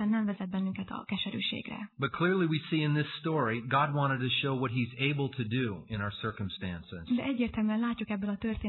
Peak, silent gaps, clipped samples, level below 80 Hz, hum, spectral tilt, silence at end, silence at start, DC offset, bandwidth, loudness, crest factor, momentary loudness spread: -14 dBFS; none; under 0.1%; -58 dBFS; none; -9.5 dB/octave; 0 s; 0 s; under 0.1%; 4.3 kHz; -32 LUFS; 16 dB; 8 LU